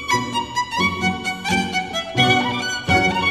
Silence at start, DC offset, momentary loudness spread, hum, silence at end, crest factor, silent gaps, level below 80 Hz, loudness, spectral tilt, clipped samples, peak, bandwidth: 0 s; under 0.1%; 7 LU; none; 0 s; 18 dB; none; -46 dBFS; -19 LUFS; -3.5 dB/octave; under 0.1%; -2 dBFS; 14 kHz